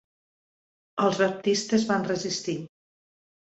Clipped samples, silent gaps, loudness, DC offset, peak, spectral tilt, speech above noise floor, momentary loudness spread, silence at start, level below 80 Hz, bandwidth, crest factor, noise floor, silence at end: under 0.1%; none; -26 LUFS; under 0.1%; -10 dBFS; -4.5 dB/octave; over 65 dB; 12 LU; 0.95 s; -68 dBFS; 8.2 kHz; 18 dB; under -90 dBFS; 0.75 s